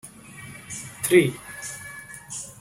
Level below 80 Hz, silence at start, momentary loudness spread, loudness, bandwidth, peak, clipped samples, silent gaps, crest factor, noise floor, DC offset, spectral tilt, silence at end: -60 dBFS; 0.05 s; 22 LU; -25 LUFS; 16 kHz; -4 dBFS; under 0.1%; none; 24 dB; -43 dBFS; under 0.1%; -4.5 dB/octave; 0.05 s